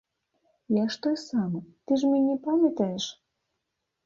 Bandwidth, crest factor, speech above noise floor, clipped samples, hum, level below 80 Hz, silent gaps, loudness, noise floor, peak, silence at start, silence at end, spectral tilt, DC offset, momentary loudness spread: 7.6 kHz; 16 dB; 56 dB; under 0.1%; none; -72 dBFS; none; -27 LUFS; -82 dBFS; -12 dBFS; 0.7 s; 0.95 s; -6 dB/octave; under 0.1%; 9 LU